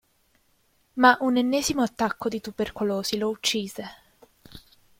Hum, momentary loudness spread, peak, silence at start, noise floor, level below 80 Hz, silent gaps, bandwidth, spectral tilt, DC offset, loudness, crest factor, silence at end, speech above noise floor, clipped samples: none; 16 LU; -2 dBFS; 0.95 s; -66 dBFS; -58 dBFS; none; 16.5 kHz; -3 dB/octave; under 0.1%; -24 LUFS; 24 dB; 0.4 s; 42 dB; under 0.1%